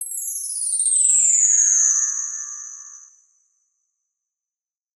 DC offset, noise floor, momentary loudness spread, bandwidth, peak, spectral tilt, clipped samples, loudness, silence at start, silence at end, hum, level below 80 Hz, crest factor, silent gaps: under 0.1%; under -90 dBFS; 18 LU; 14.5 kHz; -2 dBFS; 12 dB/octave; under 0.1%; -16 LUFS; 0 s; 2 s; none; under -90 dBFS; 20 dB; none